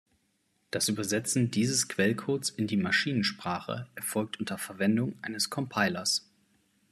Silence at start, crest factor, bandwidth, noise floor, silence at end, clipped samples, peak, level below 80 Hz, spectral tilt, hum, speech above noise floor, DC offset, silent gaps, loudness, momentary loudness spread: 0.75 s; 20 dB; 14 kHz; -74 dBFS; 0.7 s; under 0.1%; -10 dBFS; -72 dBFS; -3.5 dB/octave; none; 44 dB; under 0.1%; none; -29 LUFS; 8 LU